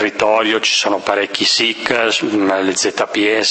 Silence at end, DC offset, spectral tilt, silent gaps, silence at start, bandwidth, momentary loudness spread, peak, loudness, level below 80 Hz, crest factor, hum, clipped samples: 0 s; under 0.1%; -1.5 dB/octave; none; 0 s; 8.8 kHz; 4 LU; 0 dBFS; -15 LUFS; -58 dBFS; 16 dB; none; under 0.1%